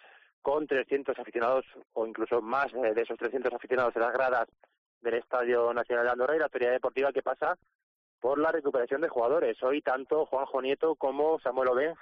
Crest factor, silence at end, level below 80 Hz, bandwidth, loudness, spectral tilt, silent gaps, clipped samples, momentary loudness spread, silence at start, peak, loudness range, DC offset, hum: 12 dB; 0.1 s; -70 dBFS; 5.8 kHz; -30 LUFS; -2.5 dB/octave; 4.78-5.01 s, 7.75-8.18 s; under 0.1%; 6 LU; 0.45 s; -18 dBFS; 2 LU; under 0.1%; none